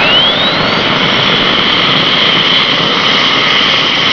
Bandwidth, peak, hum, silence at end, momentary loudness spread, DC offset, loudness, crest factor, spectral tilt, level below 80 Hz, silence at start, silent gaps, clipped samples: 5.4 kHz; 0 dBFS; none; 0 s; 3 LU; 0.6%; -7 LUFS; 10 dB; -3.5 dB/octave; -40 dBFS; 0 s; none; 0.1%